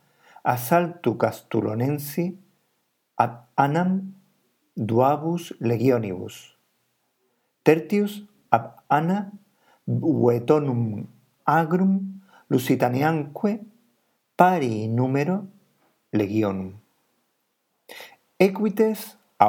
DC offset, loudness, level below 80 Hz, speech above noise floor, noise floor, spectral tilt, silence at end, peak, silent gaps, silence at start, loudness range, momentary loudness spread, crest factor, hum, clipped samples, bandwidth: under 0.1%; -23 LUFS; -76 dBFS; 51 dB; -73 dBFS; -7.5 dB/octave; 0 s; 0 dBFS; none; 0.45 s; 4 LU; 18 LU; 24 dB; none; under 0.1%; 19 kHz